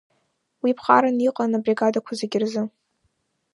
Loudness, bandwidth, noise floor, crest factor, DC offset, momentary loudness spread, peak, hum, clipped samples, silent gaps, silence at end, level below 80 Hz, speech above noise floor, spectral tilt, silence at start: -22 LUFS; 11 kHz; -71 dBFS; 22 dB; under 0.1%; 9 LU; -2 dBFS; none; under 0.1%; none; 0.9 s; -76 dBFS; 50 dB; -5.5 dB/octave; 0.65 s